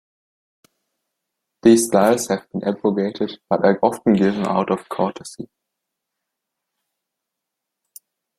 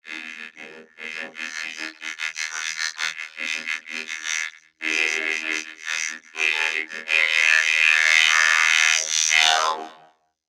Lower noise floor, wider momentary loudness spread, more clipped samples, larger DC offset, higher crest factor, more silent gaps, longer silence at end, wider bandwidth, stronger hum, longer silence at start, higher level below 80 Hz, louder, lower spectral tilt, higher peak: first, -82 dBFS vs -43 dBFS; second, 13 LU vs 17 LU; neither; neither; about the same, 20 dB vs 20 dB; neither; first, 2.95 s vs 0.55 s; about the same, 15.5 kHz vs 16.5 kHz; neither; first, 1.65 s vs 0.05 s; first, -60 dBFS vs -82 dBFS; about the same, -19 LUFS vs -20 LUFS; first, -5.5 dB/octave vs 3 dB/octave; about the same, -2 dBFS vs -2 dBFS